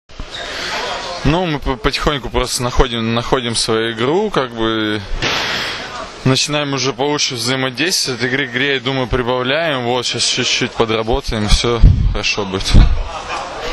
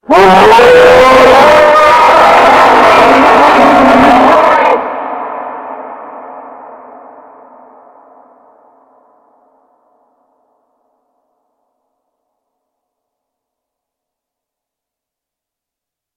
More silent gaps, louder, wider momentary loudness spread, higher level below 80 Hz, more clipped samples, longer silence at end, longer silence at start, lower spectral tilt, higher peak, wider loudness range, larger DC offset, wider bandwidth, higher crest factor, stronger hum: neither; second, -16 LUFS vs -4 LUFS; second, 7 LU vs 21 LU; first, -22 dBFS vs -38 dBFS; second, 0.2% vs 3%; second, 0 s vs 9.65 s; about the same, 0.1 s vs 0.1 s; about the same, -4 dB/octave vs -4.5 dB/octave; about the same, 0 dBFS vs 0 dBFS; second, 2 LU vs 21 LU; neither; second, 13.5 kHz vs 16.5 kHz; first, 16 dB vs 10 dB; neither